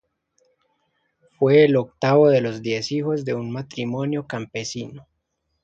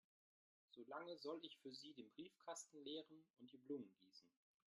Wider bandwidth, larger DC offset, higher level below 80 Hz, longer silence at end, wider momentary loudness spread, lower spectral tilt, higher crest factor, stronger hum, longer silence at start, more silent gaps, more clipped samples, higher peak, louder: second, 7.8 kHz vs 11.5 kHz; neither; first, -64 dBFS vs under -90 dBFS; first, 0.6 s vs 0.4 s; about the same, 14 LU vs 15 LU; first, -6.5 dB/octave vs -3 dB/octave; about the same, 18 dB vs 20 dB; neither; first, 1.4 s vs 0.7 s; neither; neither; first, -4 dBFS vs -38 dBFS; first, -21 LUFS vs -56 LUFS